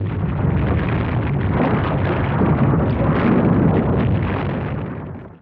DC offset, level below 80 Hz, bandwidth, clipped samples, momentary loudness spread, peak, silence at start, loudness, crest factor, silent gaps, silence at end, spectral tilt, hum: under 0.1%; -30 dBFS; 4.9 kHz; under 0.1%; 8 LU; -4 dBFS; 0 s; -19 LUFS; 14 dB; none; 0.05 s; -11.5 dB/octave; none